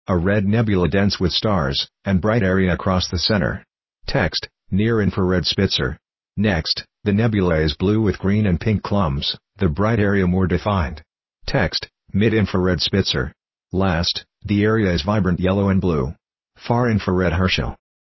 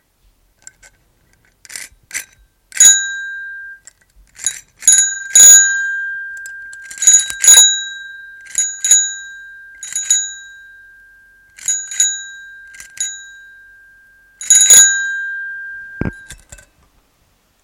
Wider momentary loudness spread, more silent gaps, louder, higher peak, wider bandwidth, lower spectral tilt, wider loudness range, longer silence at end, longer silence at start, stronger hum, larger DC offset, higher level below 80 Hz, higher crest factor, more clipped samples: second, 7 LU vs 26 LU; neither; second, -20 LUFS vs -9 LUFS; second, -4 dBFS vs 0 dBFS; second, 6.2 kHz vs over 20 kHz; first, -6.5 dB/octave vs 2 dB/octave; second, 1 LU vs 12 LU; second, 0.35 s vs 1.3 s; second, 0.1 s vs 1.7 s; neither; neither; first, -32 dBFS vs -48 dBFS; about the same, 16 dB vs 16 dB; second, under 0.1% vs 0.5%